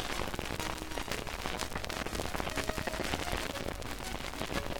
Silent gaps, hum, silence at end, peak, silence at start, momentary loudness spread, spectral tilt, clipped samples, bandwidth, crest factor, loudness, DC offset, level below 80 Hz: none; none; 0 s; -10 dBFS; 0 s; 4 LU; -3.5 dB/octave; under 0.1%; 19 kHz; 26 dB; -37 LUFS; under 0.1%; -44 dBFS